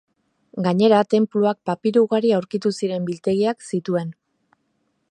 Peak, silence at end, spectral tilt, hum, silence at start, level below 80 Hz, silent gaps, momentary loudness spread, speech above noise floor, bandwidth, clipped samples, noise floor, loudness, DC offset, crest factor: -4 dBFS; 1 s; -7 dB/octave; none; 0.55 s; -68 dBFS; none; 9 LU; 50 dB; 10.5 kHz; under 0.1%; -70 dBFS; -20 LUFS; under 0.1%; 18 dB